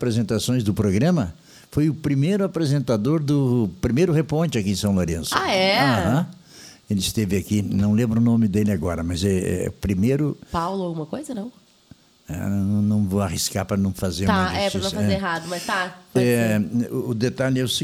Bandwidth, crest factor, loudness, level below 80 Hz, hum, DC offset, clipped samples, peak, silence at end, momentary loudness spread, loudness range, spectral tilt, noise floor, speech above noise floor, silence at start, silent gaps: 16 kHz; 16 dB; -22 LUFS; -44 dBFS; none; under 0.1%; under 0.1%; -4 dBFS; 0 s; 7 LU; 4 LU; -5.5 dB/octave; -52 dBFS; 31 dB; 0 s; none